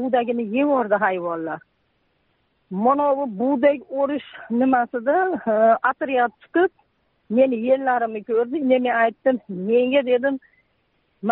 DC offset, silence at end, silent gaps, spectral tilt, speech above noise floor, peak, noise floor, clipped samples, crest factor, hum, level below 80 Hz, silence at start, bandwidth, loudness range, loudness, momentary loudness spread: under 0.1%; 0 s; none; -4 dB/octave; 47 dB; -6 dBFS; -67 dBFS; under 0.1%; 16 dB; none; -70 dBFS; 0 s; 4.1 kHz; 3 LU; -21 LUFS; 8 LU